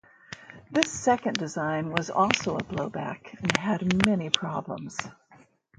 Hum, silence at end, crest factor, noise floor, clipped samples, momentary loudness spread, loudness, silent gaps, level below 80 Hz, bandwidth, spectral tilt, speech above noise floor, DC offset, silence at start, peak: none; 0.45 s; 28 dB; -58 dBFS; under 0.1%; 13 LU; -27 LUFS; none; -58 dBFS; 11.5 kHz; -4 dB/octave; 31 dB; under 0.1%; 0.3 s; 0 dBFS